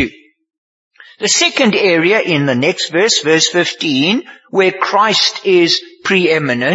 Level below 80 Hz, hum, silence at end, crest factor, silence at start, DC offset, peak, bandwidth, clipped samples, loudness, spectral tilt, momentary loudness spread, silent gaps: -56 dBFS; none; 0 s; 14 dB; 0 s; under 0.1%; 0 dBFS; 8 kHz; under 0.1%; -12 LUFS; -3 dB/octave; 4 LU; 0.58-0.91 s